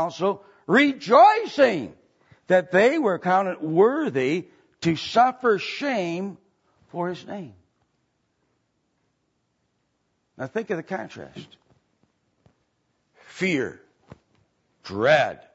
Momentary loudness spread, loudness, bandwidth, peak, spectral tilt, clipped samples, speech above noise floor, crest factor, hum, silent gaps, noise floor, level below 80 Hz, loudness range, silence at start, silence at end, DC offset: 18 LU; -22 LUFS; 8 kHz; -4 dBFS; -5.5 dB/octave; under 0.1%; 51 dB; 20 dB; none; none; -73 dBFS; -68 dBFS; 17 LU; 0 s; 0.2 s; under 0.1%